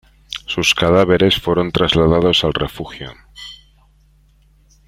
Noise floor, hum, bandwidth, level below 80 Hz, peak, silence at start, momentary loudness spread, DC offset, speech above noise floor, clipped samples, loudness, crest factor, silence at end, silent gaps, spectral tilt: -52 dBFS; none; 16 kHz; -38 dBFS; 0 dBFS; 0.3 s; 21 LU; under 0.1%; 37 dB; under 0.1%; -15 LUFS; 16 dB; 1.35 s; none; -5 dB/octave